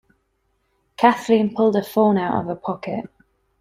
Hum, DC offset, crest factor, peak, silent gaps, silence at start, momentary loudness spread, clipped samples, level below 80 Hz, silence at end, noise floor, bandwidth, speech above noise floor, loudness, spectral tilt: none; under 0.1%; 20 dB; -2 dBFS; none; 1 s; 12 LU; under 0.1%; -62 dBFS; 0.6 s; -69 dBFS; 15.5 kHz; 50 dB; -20 LUFS; -7 dB/octave